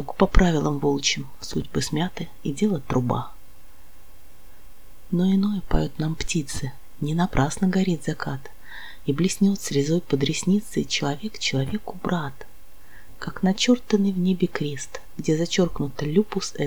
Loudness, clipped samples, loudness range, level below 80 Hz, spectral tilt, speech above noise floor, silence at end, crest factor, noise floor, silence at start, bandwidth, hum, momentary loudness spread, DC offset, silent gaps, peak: -24 LUFS; under 0.1%; 4 LU; -34 dBFS; -5.5 dB/octave; 27 dB; 0 s; 22 dB; -51 dBFS; 0 s; over 20 kHz; none; 11 LU; 2%; none; -2 dBFS